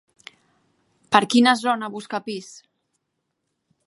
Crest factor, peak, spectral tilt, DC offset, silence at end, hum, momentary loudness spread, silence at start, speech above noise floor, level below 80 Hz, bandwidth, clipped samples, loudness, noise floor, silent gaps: 24 dB; 0 dBFS; -3.5 dB/octave; under 0.1%; 1.35 s; none; 15 LU; 1.1 s; 56 dB; -70 dBFS; 11.5 kHz; under 0.1%; -20 LUFS; -77 dBFS; none